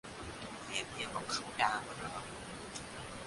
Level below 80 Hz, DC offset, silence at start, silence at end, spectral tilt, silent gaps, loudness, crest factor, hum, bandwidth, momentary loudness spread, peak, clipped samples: -62 dBFS; under 0.1%; 0.05 s; 0 s; -2.5 dB/octave; none; -39 LUFS; 24 dB; none; 11.5 kHz; 12 LU; -16 dBFS; under 0.1%